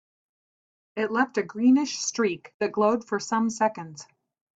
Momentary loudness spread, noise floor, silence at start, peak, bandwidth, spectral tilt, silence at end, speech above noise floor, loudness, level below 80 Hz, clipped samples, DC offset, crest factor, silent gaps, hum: 15 LU; under -90 dBFS; 0.95 s; -8 dBFS; 8 kHz; -4 dB/octave; 0.55 s; over 65 dB; -25 LUFS; -72 dBFS; under 0.1%; under 0.1%; 18 dB; 2.54-2.60 s; none